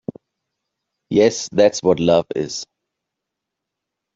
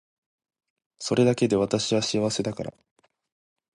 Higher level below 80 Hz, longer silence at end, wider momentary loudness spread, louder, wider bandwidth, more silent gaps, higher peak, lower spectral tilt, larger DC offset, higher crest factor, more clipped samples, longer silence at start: about the same, -58 dBFS vs -60 dBFS; first, 1.5 s vs 1.05 s; about the same, 15 LU vs 14 LU; first, -17 LUFS vs -24 LUFS; second, 7.8 kHz vs 11.5 kHz; neither; first, -2 dBFS vs -8 dBFS; about the same, -5 dB/octave vs -5 dB/octave; neither; about the same, 18 dB vs 18 dB; neither; about the same, 1.1 s vs 1 s